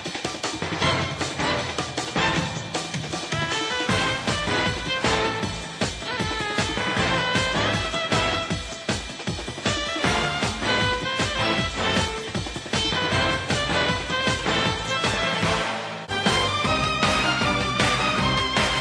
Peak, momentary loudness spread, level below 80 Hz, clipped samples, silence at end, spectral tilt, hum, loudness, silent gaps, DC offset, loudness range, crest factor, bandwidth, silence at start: -6 dBFS; 7 LU; -42 dBFS; under 0.1%; 0 s; -3.5 dB/octave; none; -23 LUFS; none; under 0.1%; 3 LU; 18 dB; 13 kHz; 0 s